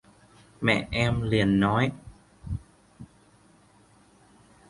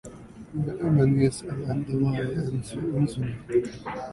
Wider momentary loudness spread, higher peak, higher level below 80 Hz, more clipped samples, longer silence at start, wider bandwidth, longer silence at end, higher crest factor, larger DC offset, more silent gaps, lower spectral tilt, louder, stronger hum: about the same, 15 LU vs 13 LU; about the same, -8 dBFS vs -8 dBFS; about the same, -46 dBFS vs -50 dBFS; neither; first, 0.6 s vs 0.05 s; about the same, 11.5 kHz vs 11.5 kHz; first, 1.65 s vs 0 s; about the same, 22 dB vs 18 dB; neither; neither; second, -6.5 dB/octave vs -8 dB/octave; about the same, -26 LUFS vs -27 LUFS; neither